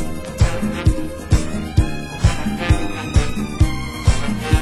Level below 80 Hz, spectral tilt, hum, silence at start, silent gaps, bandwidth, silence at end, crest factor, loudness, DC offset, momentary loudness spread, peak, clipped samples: -22 dBFS; -6 dB/octave; none; 0 s; none; 16 kHz; 0 s; 16 dB; -20 LUFS; under 0.1%; 3 LU; -2 dBFS; under 0.1%